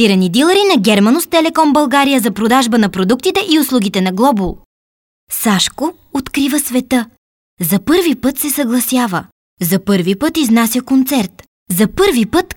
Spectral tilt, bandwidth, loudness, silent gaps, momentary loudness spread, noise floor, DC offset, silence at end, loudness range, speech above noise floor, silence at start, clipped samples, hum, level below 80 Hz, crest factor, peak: -4.5 dB/octave; 19 kHz; -13 LUFS; 4.66-5.27 s, 7.18-7.57 s, 9.32-9.57 s, 11.48-11.66 s; 9 LU; under -90 dBFS; under 0.1%; 0.05 s; 4 LU; over 77 dB; 0 s; under 0.1%; none; -42 dBFS; 12 dB; 0 dBFS